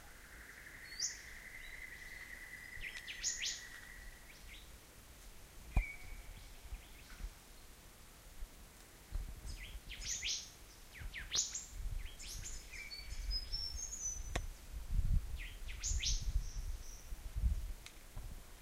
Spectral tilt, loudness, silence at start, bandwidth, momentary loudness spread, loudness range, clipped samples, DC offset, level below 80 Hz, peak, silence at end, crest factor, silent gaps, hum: -1.5 dB/octave; -44 LUFS; 0 s; 16 kHz; 19 LU; 7 LU; under 0.1%; under 0.1%; -46 dBFS; -20 dBFS; 0 s; 24 dB; none; none